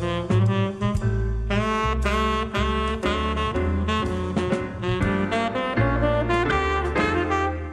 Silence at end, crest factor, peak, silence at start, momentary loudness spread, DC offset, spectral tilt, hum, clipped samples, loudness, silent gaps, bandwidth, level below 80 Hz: 0 s; 14 dB; -8 dBFS; 0 s; 3 LU; under 0.1%; -6.5 dB/octave; none; under 0.1%; -23 LUFS; none; 11.5 kHz; -30 dBFS